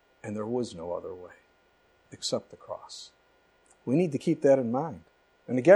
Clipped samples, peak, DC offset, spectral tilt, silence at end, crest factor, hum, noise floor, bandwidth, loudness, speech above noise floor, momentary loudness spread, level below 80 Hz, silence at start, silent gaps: under 0.1%; -6 dBFS; under 0.1%; -6 dB/octave; 0 s; 22 dB; none; -65 dBFS; 11.5 kHz; -30 LUFS; 38 dB; 22 LU; -70 dBFS; 0.25 s; none